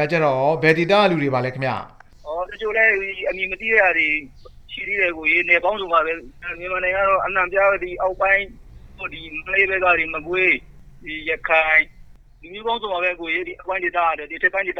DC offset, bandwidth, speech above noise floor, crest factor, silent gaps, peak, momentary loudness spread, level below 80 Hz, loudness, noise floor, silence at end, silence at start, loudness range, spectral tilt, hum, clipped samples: under 0.1%; 9.6 kHz; 24 dB; 20 dB; none; -2 dBFS; 14 LU; -46 dBFS; -19 LUFS; -44 dBFS; 0 s; 0 s; 2 LU; -6 dB/octave; none; under 0.1%